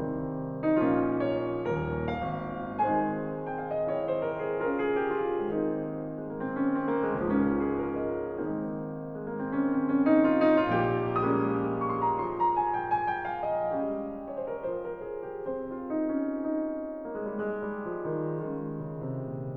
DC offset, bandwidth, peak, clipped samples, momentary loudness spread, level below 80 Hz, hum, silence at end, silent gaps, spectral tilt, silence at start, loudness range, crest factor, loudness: under 0.1%; 4.9 kHz; -12 dBFS; under 0.1%; 10 LU; -56 dBFS; none; 0 s; none; -10 dB/octave; 0 s; 7 LU; 18 dB; -30 LUFS